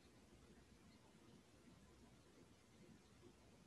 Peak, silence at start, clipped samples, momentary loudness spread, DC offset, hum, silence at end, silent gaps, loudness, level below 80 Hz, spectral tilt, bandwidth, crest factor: -54 dBFS; 0 s; under 0.1%; 1 LU; under 0.1%; none; 0 s; none; -68 LUFS; -78 dBFS; -5 dB/octave; 12 kHz; 16 dB